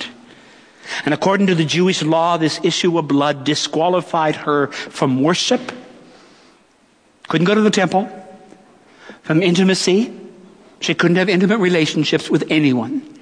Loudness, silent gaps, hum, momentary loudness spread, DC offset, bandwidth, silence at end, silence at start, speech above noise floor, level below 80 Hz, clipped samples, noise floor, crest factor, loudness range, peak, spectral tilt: -17 LUFS; none; none; 10 LU; under 0.1%; 10.5 kHz; 0.05 s; 0 s; 38 dB; -66 dBFS; under 0.1%; -55 dBFS; 16 dB; 4 LU; -2 dBFS; -5 dB/octave